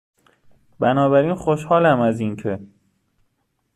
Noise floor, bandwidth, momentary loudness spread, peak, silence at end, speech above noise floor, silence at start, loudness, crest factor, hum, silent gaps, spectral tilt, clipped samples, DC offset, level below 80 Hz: -70 dBFS; 12 kHz; 12 LU; -4 dBFS; 1.1 s; 52 dB; 0.8 s; -19 LUFS; 18 dB; none; none; -7.5 dB/octave; under 0.1%; under 0.1%; -56 dBFS